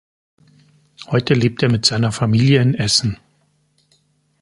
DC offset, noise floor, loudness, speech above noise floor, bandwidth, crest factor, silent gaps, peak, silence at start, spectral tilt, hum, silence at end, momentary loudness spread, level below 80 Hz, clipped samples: under 0.1%; -61 dBFS; -16 LUFS; 46 dB; 11.5 kHz; 18 dB; none; 0 dBFS; 1 s; -5 dB/octave; none; 1.25 s; 7 LU; -48 dBFS; under 0.1%